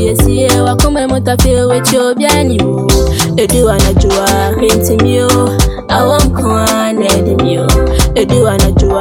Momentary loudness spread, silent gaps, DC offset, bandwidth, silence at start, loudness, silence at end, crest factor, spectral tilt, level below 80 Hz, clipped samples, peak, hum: 3 LU; none; under 0.1%; 18 kHz; 0 s; -10 LUFS; 0 s; 10 dB; -5 dB/octave; -16 dBFS; under 0.1%; 0 dBFS; none